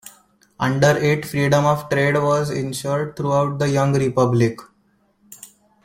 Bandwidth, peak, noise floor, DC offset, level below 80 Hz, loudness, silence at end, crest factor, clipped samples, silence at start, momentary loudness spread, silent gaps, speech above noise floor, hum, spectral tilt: 16.5 kHz; -2 dBFS; -62 dBFS; under 0.1%; -54 dBFS; -19 LUFS; 0.4 s; 18 dB; under 0.1%; 0.05 s; 7 LU; none; 43 dB; none; -6 dB/octave